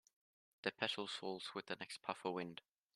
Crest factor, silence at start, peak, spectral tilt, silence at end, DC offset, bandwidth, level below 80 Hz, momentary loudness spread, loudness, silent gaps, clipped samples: 26 dB; 0.65 s; -22 dBFS; -3.5 dB/octave; 0.35 s; under 0.1%; 13 kHz; -90 dBFS; 7 LU; -45 LUFS; none; under 0.1%